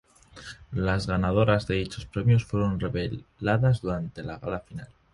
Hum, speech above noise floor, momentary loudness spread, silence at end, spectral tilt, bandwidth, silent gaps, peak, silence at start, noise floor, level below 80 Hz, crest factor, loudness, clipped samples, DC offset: none; 20 dB; 15 LU; 0.3 s; -7.5 dB/octave; 11.5 kHz; none; -6 dBFS; 0.35 s; -46 dBFS; -44 dBFS; 20 dB; -27 LUFS; under 0.1%; under 0.1%